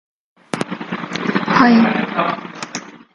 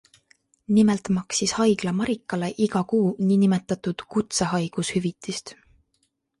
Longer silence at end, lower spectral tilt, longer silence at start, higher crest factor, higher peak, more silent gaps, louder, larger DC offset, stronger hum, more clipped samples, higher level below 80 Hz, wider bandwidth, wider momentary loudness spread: second, 0.2 s vs 0.9 s; about the same, -5.5 dB/octave vs -5 dB/octave; second, 0.55 s vs 0.7 s; about the same, 18 dB vs 16 dB; first, 0 dBFS vs -8 dBFS; neither; first, -17 LUFS vs -24 LUFS; neither; neither; neither; about the same, -56 dBFS vs -58 dBFS; about the same, 11 kHz vs 11.5 kHz; first, 17 LU vs 9 LU